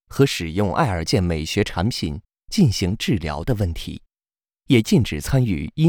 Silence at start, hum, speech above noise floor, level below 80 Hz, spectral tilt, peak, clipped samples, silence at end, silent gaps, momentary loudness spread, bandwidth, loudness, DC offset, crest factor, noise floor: 0.1 s; none; over 70 dB; -38 dBFS; -6 dB/octave; -2 dBFS; under 0.1%; 0 s; none; 8 LU; 20 kHz; -21 LUFS; under 0.1%; 18 dB; under -90 dBFS